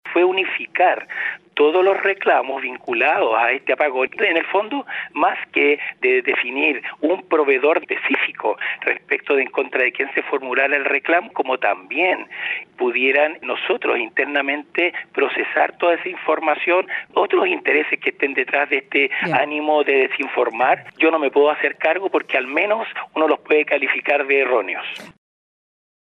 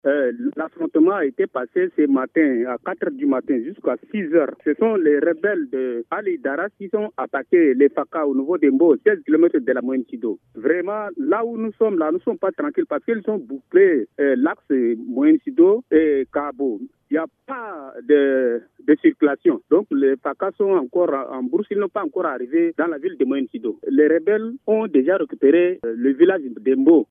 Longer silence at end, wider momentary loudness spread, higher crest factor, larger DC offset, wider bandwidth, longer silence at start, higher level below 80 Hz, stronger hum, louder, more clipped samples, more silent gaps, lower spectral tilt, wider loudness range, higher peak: first, 1.1 s vs 0.05 s; second, 6 LU vs 10 LU; about the same, 16 dB vs 16 dB; neither; first, 5.8 kHz vs 3.7 kHz; about the same, 0.05 s vs 0.05 s; about the same, -74 dBFS vs -70 dBFS; neither; about the same, -19 LUFS vs -20 LUFS; neither; neither; second, -5.5 dB/octave vs -10 dB/octave; about the same, 2 LU vs 3 LU; about the same, -4 dBFS vs -2 dBFS